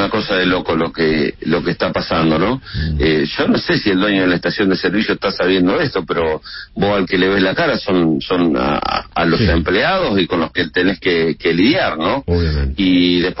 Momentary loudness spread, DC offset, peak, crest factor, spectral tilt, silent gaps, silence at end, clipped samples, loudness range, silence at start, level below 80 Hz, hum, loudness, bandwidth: 5 LU; under 0.1%; -2 dBFS; 14 dB; -9 dB/octave; none; 0 s; under 0.1%; 1 LU; 0 s; -32 dBFS; none; -16 LUFS; 5.8 kHz